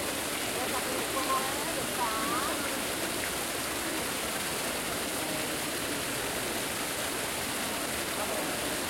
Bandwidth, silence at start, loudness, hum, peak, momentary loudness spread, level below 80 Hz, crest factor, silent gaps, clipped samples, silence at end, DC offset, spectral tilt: 16.5 kHz; 0 s; -31 LUFS; none; -18 dBFS; 2 LU; -56 dBFS; 14 dB; none; under 0.1%; 0 s; under 0.1%; -2 dB/octave